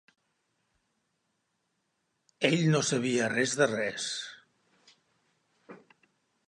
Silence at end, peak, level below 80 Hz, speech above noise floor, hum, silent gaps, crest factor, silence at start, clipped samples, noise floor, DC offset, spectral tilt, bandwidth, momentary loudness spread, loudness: 0.7 s; -10 dBFS; -76 dBFS; 51 dB; none; none; 24 dB; 2.4 s; under 0.1%; -79 dBFS; under 0.1%; -4 dB/octave; 11.5 kHz; 9 LU; -28 LUFS